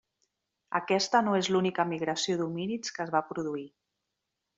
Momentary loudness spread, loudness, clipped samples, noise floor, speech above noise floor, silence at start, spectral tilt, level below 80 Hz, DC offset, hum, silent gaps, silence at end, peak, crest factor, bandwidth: 9 LU; -29 LUFS; under 0.1%; -85 dBFS; 55 dB; 0.7 s; -4.5 dB/octave; -74 dBFS; under 0.1%; none; none; 0.9 s; -10 dBFS; 20 dB; 8 kHz